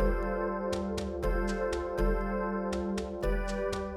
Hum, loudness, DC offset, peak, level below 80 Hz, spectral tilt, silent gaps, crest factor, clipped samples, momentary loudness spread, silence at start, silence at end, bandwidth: none; -33 LUFS; under 0.1%; -16 dBFS; -36 dBFS; -6.5 dB/octave; none; 14 dB; under 0.1%; 3 LU; 0 s; 0 s; 14 kHz